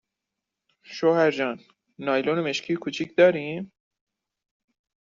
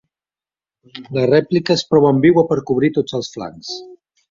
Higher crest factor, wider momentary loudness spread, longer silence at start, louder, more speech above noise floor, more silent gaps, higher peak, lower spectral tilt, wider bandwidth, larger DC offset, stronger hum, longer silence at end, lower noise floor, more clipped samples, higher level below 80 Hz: about the same, 20 dB vs 16 dB; about the same, 16 LU vs 17 LU; about the same, 0.9 s vs 0.95 s; second, -24 LUFS vs -16 LUFS; second, 62 dB vs over 74 dB; neither; second, -6 dBFS vs -2 dBFS; second, -4 dB/octave vs -6.5 dB/octave; about the same, 7.6 kHz vs 7.6 kHz; neither; neither; first, 1.35 s vs 0.4 s; second, -85 dBFS vs under -90 dBFS; neither; second, -72 dBFS vs -54 dBFS